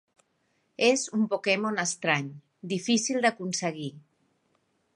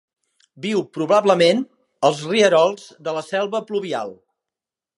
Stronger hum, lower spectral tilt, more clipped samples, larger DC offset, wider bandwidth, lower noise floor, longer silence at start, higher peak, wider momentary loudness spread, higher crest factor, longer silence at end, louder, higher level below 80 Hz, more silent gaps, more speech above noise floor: neither; about the same, -3.5 dB/octave vs -4.5 dB/octave; neither; neither; about the same, 11.5 kHz vs 11.5 kHz; second, -73 dBFS vs -88 dBFS; first, 0.8 s vs 0.6 s; second, -8 dBFS vs -2 dBFS; about the same, 13 LU vs 13 LU; about the same, 20 dB vs 20 dB; about the same, 0.95 s vs 0.85 s; second, -27 LUFS vs -19 LUFS; second, -80 dBFS vs -74 dBFS; neither; second, 45 dB vs 69 dB